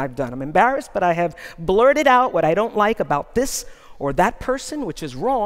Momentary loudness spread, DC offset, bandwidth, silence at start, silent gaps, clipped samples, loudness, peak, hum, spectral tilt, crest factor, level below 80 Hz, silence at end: 13 LU; under 0.1%; 16 kHz; 0 s; none; under 0.1%; -20 LUFS; -2 dBFS; none; -4.5 dB/octave; 18 dB; -42 dBFS; 0 s